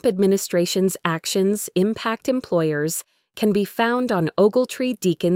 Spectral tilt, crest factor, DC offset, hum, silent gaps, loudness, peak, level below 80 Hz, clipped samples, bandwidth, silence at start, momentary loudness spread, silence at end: -5 dB/octave; 18 dB; under 0.1%; none; none; -21 LUFS; -2 dBFS; -62 dBFS; under 0.1%; 16.5 kHz; 0.05 s; 6 LU; 0 s